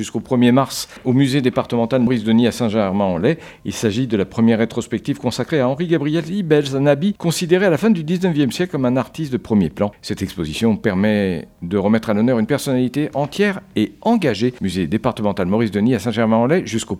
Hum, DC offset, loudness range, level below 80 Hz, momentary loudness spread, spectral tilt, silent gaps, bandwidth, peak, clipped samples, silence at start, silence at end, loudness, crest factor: none; under 0.1%; 2 LU; -48 dBFS; 7 LU; -6 dB/octave; none; 15.5 kHz; -2 dBFS; under 0.1%; 0 s; 0 s; -18 LUFS; 16 dB